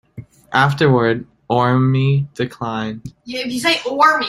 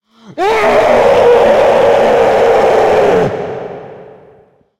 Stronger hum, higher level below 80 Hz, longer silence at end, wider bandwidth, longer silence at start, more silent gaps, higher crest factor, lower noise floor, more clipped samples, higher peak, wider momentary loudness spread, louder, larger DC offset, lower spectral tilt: neither; second, -52 dBFS vs -40 dBFS; second, 0 s vs 0.75 s; second, 13.5 kHz vs 15.5 kHz; second, 0.15 s vs 0.3 s; neither; first, 16 dB vs 10 dB; second, -38 dBFS vs -46 dBFS; neither; about the same, -2 dBFS vs 0 dBFS; second, 11 LU vs 15 LU; second, -17 LUFS vs -9 LUFS; neither; about the same, -6 dB/octave vs -5 dB/octave